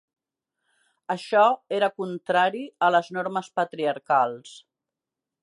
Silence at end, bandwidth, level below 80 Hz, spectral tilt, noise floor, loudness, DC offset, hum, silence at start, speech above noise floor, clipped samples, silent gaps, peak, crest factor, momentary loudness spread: 0.85 s; 11 kHz; -82 dBFS; -5 dB/octave; -88 dBFS; -24 LUFS; under 0.1%; none; 1.1 s; 64 dB; under 0.1%; none; -8 dBFS; 18 dB; 12 LU